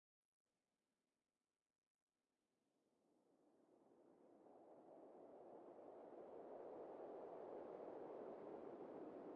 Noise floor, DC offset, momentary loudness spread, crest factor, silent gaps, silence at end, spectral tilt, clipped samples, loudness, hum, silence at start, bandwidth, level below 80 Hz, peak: under -90 dBFS; under 0.1%; 10 LU; 16 dB; none; 0 s; -6.5 dB/octave; under 0.1%; -58 LUFS; none; 3.1 s; 4.8 kHz; under -90 dBFS; -44 dBFS